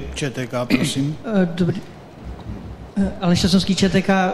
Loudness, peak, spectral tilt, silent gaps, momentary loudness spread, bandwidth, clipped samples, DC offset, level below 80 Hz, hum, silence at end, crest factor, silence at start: -20 LUFS; -4 dBFS; -5.5 dB/octave; none; 18 LU; 13 kHz; under 0.1%; under 0.1%; -38 dBFS; none; 0 s; 16 dB; 0 s